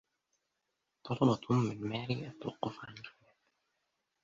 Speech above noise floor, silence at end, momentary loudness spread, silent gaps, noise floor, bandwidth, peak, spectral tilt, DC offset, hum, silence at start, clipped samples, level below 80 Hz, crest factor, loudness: 50 dB; 1.15 s; 19 LU; none; -85 dBFS; 7.6 kHz; -14 dBFS; -7.5 dB/octave; under 0.1%; none; 1.05 s; under 0.1%; -70 dBFS; 22 dB; -35 LUFS